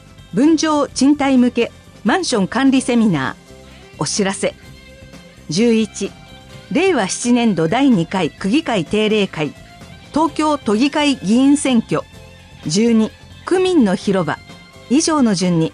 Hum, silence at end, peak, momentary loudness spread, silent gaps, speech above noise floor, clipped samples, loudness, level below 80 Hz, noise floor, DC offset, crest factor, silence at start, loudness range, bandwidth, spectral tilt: none; 0.05 s; -4 dBFS; 9 LU; none; 25 dB; under 0.1%; -16 LUFS; -48 dBFS; -40 dBFS; under 0.1%; 12 dB; 0.2 s; 3 LU; 11 kHz; -5 dB/octave